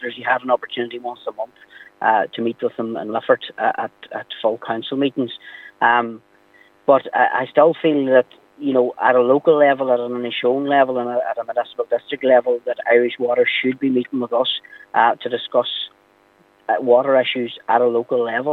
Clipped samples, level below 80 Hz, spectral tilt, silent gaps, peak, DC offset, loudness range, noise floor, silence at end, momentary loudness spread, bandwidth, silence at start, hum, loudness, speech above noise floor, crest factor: under 0.1%; -76 dBFS; -7 dB/octave; none; -2 dBFS; under 0.1%; 6 LU; -55 dBFS; 0 s; 12 LU; 4.2 kHz; 0 s; none; -19 LUFS; 37 dB; 16 dB